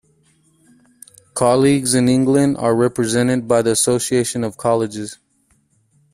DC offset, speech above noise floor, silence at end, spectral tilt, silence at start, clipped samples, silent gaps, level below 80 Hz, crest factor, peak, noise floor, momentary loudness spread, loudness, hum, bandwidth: under 0.1%; 45 dB; 1 s; -5 dB/octave; 1.35 s; under 0.1%; none; -54 dBFS; 16 dB; -2 dBFS; -61 dBFS; 7 LU; -16 LUFS; none; 15.5 kHz